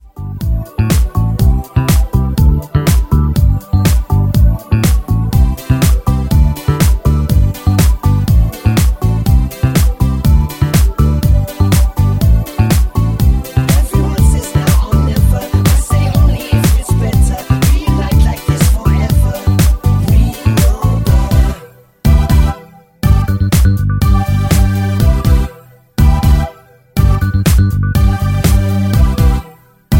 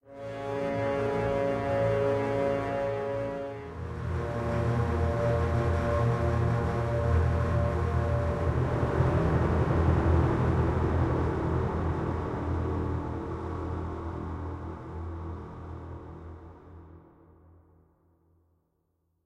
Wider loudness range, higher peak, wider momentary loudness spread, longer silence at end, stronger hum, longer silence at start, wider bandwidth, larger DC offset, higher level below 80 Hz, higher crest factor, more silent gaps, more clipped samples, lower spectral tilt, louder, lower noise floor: second, 1 LU vs 14 LU; first, 0 dBFS vs -14 dBFS; second, 3 LU vs 13 LU; second, 0 s vs 2.25 s; neither; about the same, 0.15 s vs 0.05 s; first, 17 kHz vs 9 kHz; neither; first, -14 dBFS vs -38 dBFS; second, 10 dB vs 16 dB; neither; neither; second, -6.5 dB/octave vs -8.5 dB/octave; first, -13 LUFS vs -29 LUFS; second, -38 dBFS vs -75 dBFS